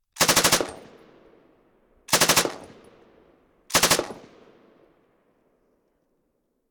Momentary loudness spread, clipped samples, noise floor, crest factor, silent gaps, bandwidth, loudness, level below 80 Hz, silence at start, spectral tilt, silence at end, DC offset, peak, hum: 20 LU; under 0.1%; -73 dBFS; 18 dB; none; over 20 kHz; -20 LUFS; -54 dBFS; 0.15 s; -1 dB/octave; 2.55 s; under 0.1%; -10 dBFS; none